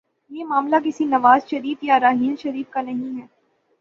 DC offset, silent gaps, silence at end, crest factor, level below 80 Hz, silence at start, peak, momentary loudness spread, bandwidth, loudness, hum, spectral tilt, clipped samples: under 0.1%; none; 0.55 s; 18 dB; -68 dBFS; 0.3 s; -2 dBFS; 16 LU; 7.2 kHz; -20 LUFS; none; -5.5 dB/octave; under 0.1%